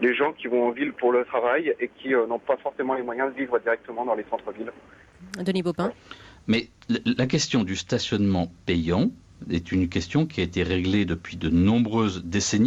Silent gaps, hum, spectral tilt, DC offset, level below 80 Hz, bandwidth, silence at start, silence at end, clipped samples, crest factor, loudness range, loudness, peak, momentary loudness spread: none; none; -5.5 dB/octave; under 0.1%; -48 dBFS; 10.5 kHz; 0 s; 0 s; under 0.1%; 14 dB; 4 LU; -25 LUFS; -10 dBFS; 8 LU